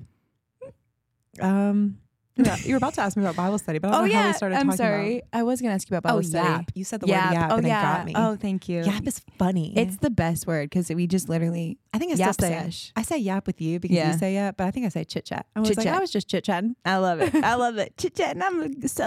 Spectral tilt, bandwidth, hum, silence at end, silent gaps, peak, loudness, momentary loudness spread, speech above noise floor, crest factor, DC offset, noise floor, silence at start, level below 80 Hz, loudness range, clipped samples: -5.5 dB/octave; 15.5 kHz; none; 0 s; none; -6 dBFS; -24 LUFS; 7 LU; 50 dB; 18 dB; under 0.1%; -74 dBFS; 0 s; -52 dBFS; 3 LU; under 0.1%